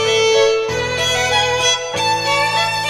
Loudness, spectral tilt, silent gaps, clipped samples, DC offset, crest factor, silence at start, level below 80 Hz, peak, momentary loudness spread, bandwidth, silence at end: -15 LUFS; -1.5 dB/octave; none; under 0.1%; under 0.1%; 14 dB; 0 s; -44 dBFS; -2 dBFS; 4 LU; 16 kHz; 0 s